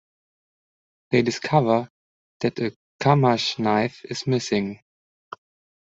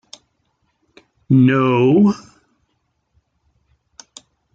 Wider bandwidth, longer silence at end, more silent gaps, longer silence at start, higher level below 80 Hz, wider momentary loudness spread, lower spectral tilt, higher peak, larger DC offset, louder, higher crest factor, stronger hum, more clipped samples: about the same, 8 kHz vs 7.8 kHz; second, 1.1 s vs 2.35 s; first, 1.90-2.40 s, 2.76-2.99 s vs none; second, 1.1 s vs 1.3 s; about the same, -64 dBFS vs -60 dBFS; first, 24 LU vs 4 LU; second, -6 dB/octave vs -8 dB/octave; about the same, -2 dBFS vs -4 dBFS; neither; second, -23 LUFS vs -15 LUFS; first, 22 dB vs 16 dB; neither; neither